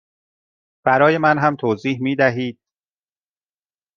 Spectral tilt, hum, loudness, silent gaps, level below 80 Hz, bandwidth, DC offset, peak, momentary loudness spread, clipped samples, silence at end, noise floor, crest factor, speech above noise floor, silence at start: -7.5 dB/octave; none; -18 LUFS; none; -66 dBFS; 7 kHz; under 0.1%; -2 dBFS; 9 LU; under 0.1%; 1.45 s; under -90 dBFS; 18 dB; over 73 dB; 0.85 s